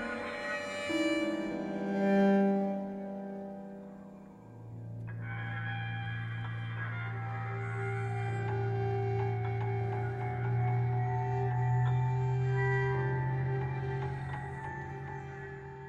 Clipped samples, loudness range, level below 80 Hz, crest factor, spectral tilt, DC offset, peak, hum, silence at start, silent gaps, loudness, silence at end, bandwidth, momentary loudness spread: under 0.1%; 8 LU; -58 dBFS; 14 dB; -8 dB/octave; under 0.1%; -18 dBFS; none; 0 s; none; -34 LUFS; 0 s; 9.8 kHz; 13 LU